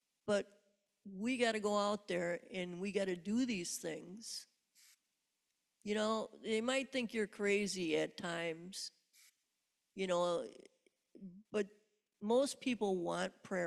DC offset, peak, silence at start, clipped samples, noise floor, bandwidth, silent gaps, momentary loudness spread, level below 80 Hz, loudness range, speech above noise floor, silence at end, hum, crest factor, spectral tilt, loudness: under 0.1%; -20 dBFS; 0.25 s; under 0.1%; -86 dBFS; 13.5 kHz; none; 12 LU; -78 dBFS; 5 LU; 48 dB; 0 s; none; 18 dB; -4 dB/octave; -39 LUFS